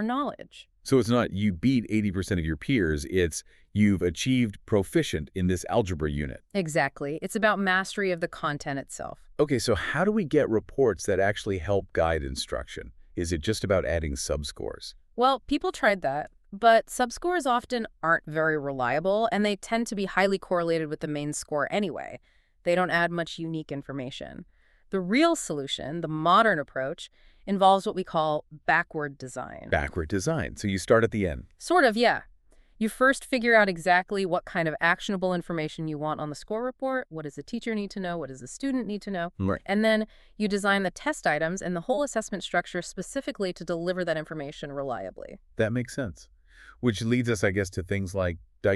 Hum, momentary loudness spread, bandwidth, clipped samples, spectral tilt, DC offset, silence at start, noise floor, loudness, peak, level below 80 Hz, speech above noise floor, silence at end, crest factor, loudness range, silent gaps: none; 12 LU; 13.5 kHz; under 0.1%; -5 dB/octave; under 0.1%; 0 s; -57 dBFS; -27 LUFS; -6 dBFS; -48 dBFS; 30 dB; 0 s; 20 dB; 6 LU; none